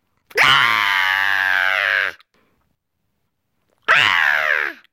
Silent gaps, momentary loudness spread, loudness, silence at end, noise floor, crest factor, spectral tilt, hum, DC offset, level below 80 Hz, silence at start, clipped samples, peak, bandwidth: none; 8 LU; -15 LUFS; 0.2 s; -73 dBFS; 16 dB; -1 dB/octave; none; under 0.1%; -62 dBFS; 0.35 s; under 0.1%; -2 dBFS; 17 kHz